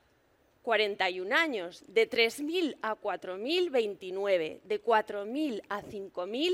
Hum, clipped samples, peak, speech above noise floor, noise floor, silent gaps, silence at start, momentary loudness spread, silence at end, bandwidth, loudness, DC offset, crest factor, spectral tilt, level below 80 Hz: none; under 0.1%; -12 dBFS; 37 dB; -68 dBFS; none; 0.65 s; 10 LU; 0 s; 16 kHz; -31 LUFS; under 0.1%; 20 dB; -3.5 dB/octave; -74 dBFS